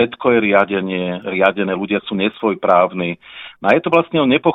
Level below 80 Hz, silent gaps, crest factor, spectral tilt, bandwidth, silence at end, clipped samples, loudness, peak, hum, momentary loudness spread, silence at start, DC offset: -56 dBFS; none; 16 dB; -8 dB/octave; 6.2 kHz; 0 s; under 0.1%; -16 LUFS; 0 dBFS; none; 8 LU; 0 s; under 0.1%